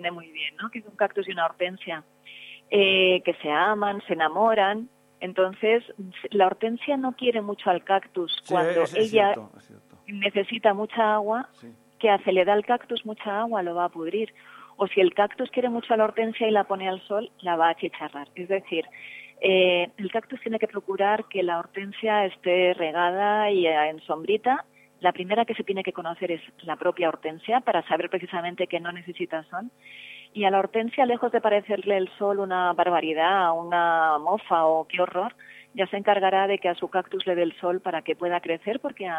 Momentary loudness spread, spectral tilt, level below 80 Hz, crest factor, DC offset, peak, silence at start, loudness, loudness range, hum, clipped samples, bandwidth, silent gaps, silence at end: 11 LU; -5.5 dB/octave; -78 dBFS; 18 dB; under 0.1%; -6 dBFS; 0 s; -25 LUFS; 4 LU; none; under 0.1%; 11.5 kHz; none; 0 s